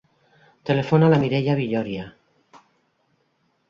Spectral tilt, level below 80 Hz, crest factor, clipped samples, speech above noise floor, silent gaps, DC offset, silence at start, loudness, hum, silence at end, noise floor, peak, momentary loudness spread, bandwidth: -8.5 dB/octave; -58 dBFS; 20 dB; under 0.1%; 48 dB; none; under 0.1%; 0.65 s; -21 LUFS; none; 1.6 s; -68 dBFS; -4 dBFS; 17 LU; 7 kHz